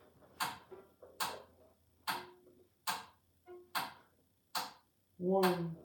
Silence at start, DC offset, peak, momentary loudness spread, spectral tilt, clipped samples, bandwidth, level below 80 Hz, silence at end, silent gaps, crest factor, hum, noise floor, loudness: 0.4 s; under 0.1%; -16 dBFS; 25 LU; -4 dB/octave; under 0.1%; 19 kHz; -80 dBFS; 0 s; none; 26 dB; none; -73 dBFS; -39 LUFS